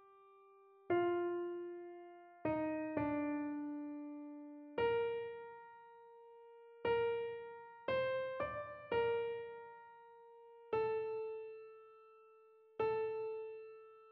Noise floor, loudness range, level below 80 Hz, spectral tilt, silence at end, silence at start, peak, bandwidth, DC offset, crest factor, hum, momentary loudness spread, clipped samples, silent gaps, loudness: -65 dBFS; 4 LU; -74 dBFS; -4.5 dB/octave; 0 s; 0 s; -24 dBFS; 5.2 kHz; under 0.1%; 18 dB; none; 23 LU; under 0.1%; none; -41 LUFS